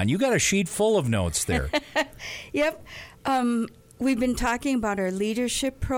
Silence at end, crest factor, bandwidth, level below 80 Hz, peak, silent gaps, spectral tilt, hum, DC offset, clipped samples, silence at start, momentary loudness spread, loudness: 0 s; 14 dB; 19 kHz; -42 dBFS; -10 dBFS; none; -4.5 dB/octave; none; under 0.1%; under 0.1%; 0 s; 9 LU; -25 LUFS